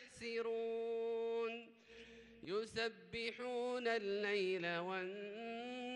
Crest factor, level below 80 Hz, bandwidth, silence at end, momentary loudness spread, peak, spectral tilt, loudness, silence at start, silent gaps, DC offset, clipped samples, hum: 16 dB; -78 dBFS; 10.5 kHz; 0 s; 15 LU; -26 dBFS; -4.5 dB/octave; -42 LUFS; 0 s; none; under 0.1%; under 0.1%; none